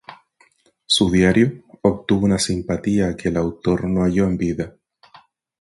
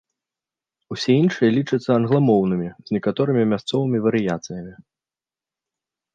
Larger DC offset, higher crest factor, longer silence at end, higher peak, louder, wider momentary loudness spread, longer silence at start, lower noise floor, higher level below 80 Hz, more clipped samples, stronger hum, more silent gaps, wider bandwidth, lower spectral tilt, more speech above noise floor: neither; about the same, 18 dB vs 16 dB; second, 0.9 s vs 1.4 s; about the same, -4 dBFS vs -4 dBFS; about the same, -19 LUFS vs -20 LUFS; second, 7 LU vs 12 LU; second, 0.1 s vs 0.9 s; second, -58 dBFS vs under -90 dBFS; first, -40 dBFS vs -60 dBFS; neither; neither; neither; first, 11.5 kHz vs 9.2 kHz; second, -5.5 dB/octave vs -7 dB/octave; second, 40 dB vs over 70 dB